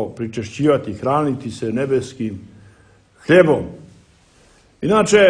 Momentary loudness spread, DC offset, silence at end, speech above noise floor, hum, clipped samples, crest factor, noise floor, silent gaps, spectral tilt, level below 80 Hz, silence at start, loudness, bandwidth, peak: 15 LU; under 0.1%; 0 s; 35 dB; none; under 0.1%; 18 dB; -52 dBFS; none; -5.5 dB/octave; -50 dBFS; 0 s; -18 LUFS; 10.5 kHz; 0 dBFS